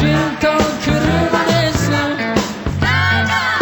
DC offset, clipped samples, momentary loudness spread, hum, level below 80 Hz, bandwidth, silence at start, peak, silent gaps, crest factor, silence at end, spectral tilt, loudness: under 0.1%; under 0.1%; 4 LU; none; -32 dBFS; 19 kHz; 0 s; -2 dBFS; none; 14 dB; 0 s; -5 dB/octave; -15 LUFS